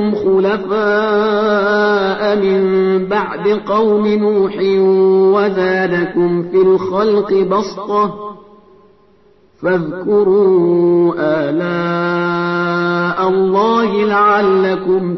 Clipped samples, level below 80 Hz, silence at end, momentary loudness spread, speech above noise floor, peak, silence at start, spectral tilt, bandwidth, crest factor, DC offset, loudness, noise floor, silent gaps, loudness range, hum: under 0.1%; -52 dBFS; 0 s; 6 LU; 37 dB; -2 dBFS; 0 s; -7.5 dB/octave; 6.2 kHz; 12 dB; 0.1%; -14 LUFS; -50 dBFS; none; 3 LU; none